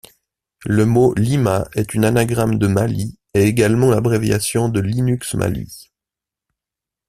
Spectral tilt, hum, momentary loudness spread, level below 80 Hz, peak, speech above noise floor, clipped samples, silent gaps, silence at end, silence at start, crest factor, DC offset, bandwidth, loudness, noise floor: -6.5 dB/octave; none; 7 LU; -44 dBFS; -2 dBFS; 71 dB; under 0.1%; none; 1.25 s; 0.6 s; 16 dB; under 0.1%; 15 kHz; -17 LUFS; -87 dBFS